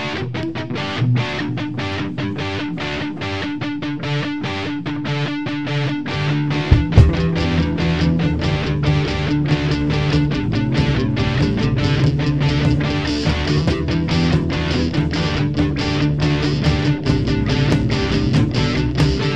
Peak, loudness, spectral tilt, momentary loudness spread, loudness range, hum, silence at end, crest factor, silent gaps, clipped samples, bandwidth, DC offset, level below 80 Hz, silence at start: 0 dBFS; -19 LUFS; -7 dB/octave; 7 LU; 5 LU; none; 0 s; 18 dB; none; under 0.1%; 8.8 kHz; 1%; -28 dBFS; 0 s